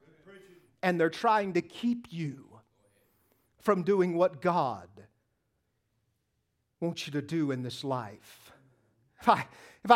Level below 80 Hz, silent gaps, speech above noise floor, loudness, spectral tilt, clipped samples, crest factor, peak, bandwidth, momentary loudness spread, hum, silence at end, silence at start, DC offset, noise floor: -74 dBFS; none; 50 dB; -30 LUFS; -6.5 dB/octave; under 0.1%; 26 dB; -6 dBFS; 16 kHz; 14 LU; none; 0 s; 0.3 s; under 0.1%; -79 dBFS